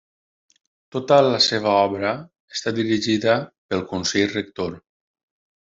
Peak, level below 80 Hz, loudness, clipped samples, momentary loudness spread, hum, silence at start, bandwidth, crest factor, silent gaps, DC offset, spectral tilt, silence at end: -2 dBFS; -64 dBFS; -21 LUFS; under 0.1%; 13 LU; none; 0.95 s; 8 kHz; 20 dB; 2.40-2.48 s, 3.58-3.69 s; under 0.1%; -4 dB/octave; 0.8 s